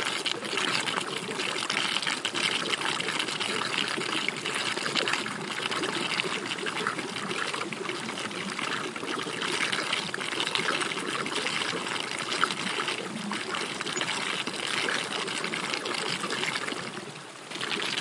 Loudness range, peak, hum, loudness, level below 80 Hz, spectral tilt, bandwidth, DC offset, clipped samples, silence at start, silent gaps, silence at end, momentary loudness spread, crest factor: 3 LU; -4 dBFS; none; -29 LUFS; -78 dBFS; -2 dB/octave; 11.5 kHz; under 0.1%; under 0.1%; 0 s; none; 0 s; 6 LU; 26 dB